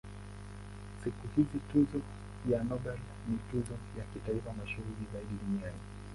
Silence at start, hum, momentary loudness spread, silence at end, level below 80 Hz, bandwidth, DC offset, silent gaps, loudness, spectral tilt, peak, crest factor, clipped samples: 0.05 s; 50 Hz at -45 dBFS; 17 LU; 0 s; -50 dBFS; 11.5 kHz; under 0.1%; none; -37 LUFS; -8 dB/octave; -16 dBFS; 20 dB; under 0.1%